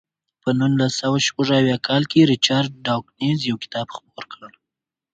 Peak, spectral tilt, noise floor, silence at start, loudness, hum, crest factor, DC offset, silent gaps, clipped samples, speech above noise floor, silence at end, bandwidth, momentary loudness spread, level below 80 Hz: -2 dBFS; -5 dB/octave; -86 dBFS; 0.45 s; -19 LUFS; none; 20 dB; under 0.1%; none; under 0.1%; 66 dB; 0.65 s; 9.2 kHz; 16 LU; -60 dBFS